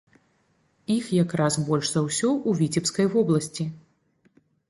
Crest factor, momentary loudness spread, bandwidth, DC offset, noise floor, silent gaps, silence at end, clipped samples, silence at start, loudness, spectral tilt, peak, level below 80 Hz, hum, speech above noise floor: 16 dB; 8 LU; 11.5 kHz; under 0.1%; -67 dBFS; none; 0.9 s; under 0.1%; 0.9 s; -24 LUFS; -5.5 dB/octave; -10 dBFS; -64 dBFS; none; 43 dB